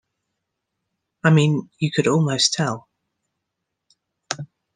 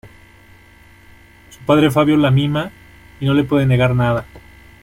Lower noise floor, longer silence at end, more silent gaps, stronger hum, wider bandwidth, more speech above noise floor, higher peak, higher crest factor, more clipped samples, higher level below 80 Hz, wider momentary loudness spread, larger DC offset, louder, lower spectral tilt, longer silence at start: first, -80 dBFS vs -46 dBFS; second, 0.3 s vs 0.45 s; neither; neither; second, 9.8 kHz vs 16 kHz; first, 61 dB vs 31 dB; about the same, -2 dBFS vs -2 dBFS; first, 22 dB vs 16 dB; neither; second, -66 dBFS vs -44 dBFS; first, 14 LU vs 10 LU; neither; second, -20 LUFS vs -16 LUFS; second, -4.5 dB/octave vs -7.5 dB/octave; first, 1.25 s vs 0.05 s